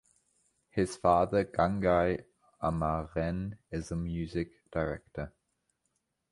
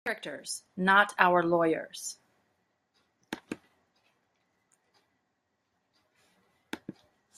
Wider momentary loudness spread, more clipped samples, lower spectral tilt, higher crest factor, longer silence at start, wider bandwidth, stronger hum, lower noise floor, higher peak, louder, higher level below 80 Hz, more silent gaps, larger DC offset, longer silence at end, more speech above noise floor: second, 12 LU vs 21 LU; neither; first, -7 dB/octave vs -4 dB/octave; second, 22 dB vs 28 dB; first, 0.75 s vs 0.05 s; second, 11.5 kHz vs 14.5 kHz; neither; about the same, -80 dBFS vs -79 dBFS; second, -12 dBFS vs -4 dBFS; second, -32 LUFS vs -27 LUFS; first, -48 dBFS vs -76 dBFS; neither; neither; first, 1.05 s vs 0.45 s; about the same, 50 dB vs 51 dB